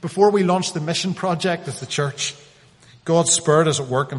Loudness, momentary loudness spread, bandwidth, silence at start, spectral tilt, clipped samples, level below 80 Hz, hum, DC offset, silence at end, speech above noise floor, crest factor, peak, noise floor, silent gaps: -20 LUFS; 10 LU; 11.5 kHz; 0.05 s; -4 dB/octave; under 0.1%; -60 dBFS; none; under 0.1%; 0 s; 30 dB; 18 dB; -2 dBFS; -50 dBFS; none